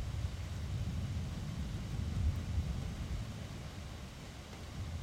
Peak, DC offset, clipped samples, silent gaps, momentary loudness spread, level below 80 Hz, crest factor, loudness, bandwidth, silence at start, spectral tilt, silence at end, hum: -24 dBFS; under 0.1%; under 0.1%; none; 11 LU; -44 dBFS; 16 dB; -41 LUFS; 15.5 kHz; 0 s; -6 dB/octave; 0 s; none